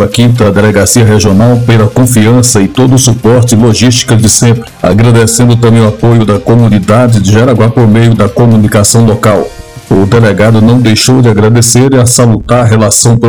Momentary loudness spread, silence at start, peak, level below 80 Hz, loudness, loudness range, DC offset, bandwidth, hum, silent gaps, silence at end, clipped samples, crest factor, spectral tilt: 2 LU; 0 s; 0 dBFS; -30 dBFS; -5 LUFS; 1 LU; 2%; over 20 kHz; none; none; 0 s; 20%; 4 dB; -5.5 dB/octave